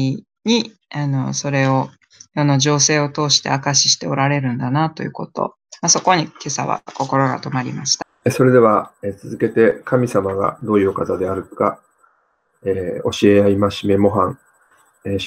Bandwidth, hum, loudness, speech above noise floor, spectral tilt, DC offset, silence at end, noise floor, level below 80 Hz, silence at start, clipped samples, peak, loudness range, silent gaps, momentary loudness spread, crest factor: 14 kHz; none; -17 LUFS; 46 dB; -4 dB/octave; under 0.1%; 0 s; -64 dBFS; -58 dBFS; 0 s; under 0.1%; -2 dBFS; 3 LU; none; 12 LU; 16 dB